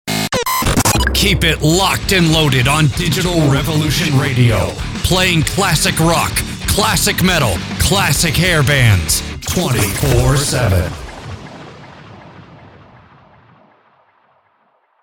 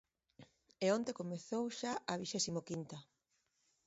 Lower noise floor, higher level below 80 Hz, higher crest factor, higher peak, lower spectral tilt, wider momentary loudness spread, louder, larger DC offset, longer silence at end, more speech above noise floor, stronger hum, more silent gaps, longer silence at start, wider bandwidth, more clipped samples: second, -58 dBFS vs -82 dBFS; first, -28 dBFS vs -80 dBFS; second, 14 dB vs 20 dB; first, 0 dBFS vs -22 dBFS; about the same, -4 dB/octave vs -4.5 dB/octave; second, 7 LU vs 10 LU; first, -13 LUFS vs -40 LUFS; neither; first, 2.35 s vs 0.85 s; about the same, 45 dB vs 42 dB; neither; neither; second, 0.05 s vs 0.4 s; first, over 20 kHz vs 7.6 kHz; neither